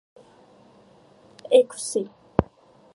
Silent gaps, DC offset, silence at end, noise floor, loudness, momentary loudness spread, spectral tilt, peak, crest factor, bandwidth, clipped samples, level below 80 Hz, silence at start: none; under 0.1%; 0.5 s; -54 dBFS; -23 LUFS; 19 LU; -5 dB/octave; 0 dBFS; 26 dB; 11.5 kHz; under 0.1%; -48 dBFS; 1.5 s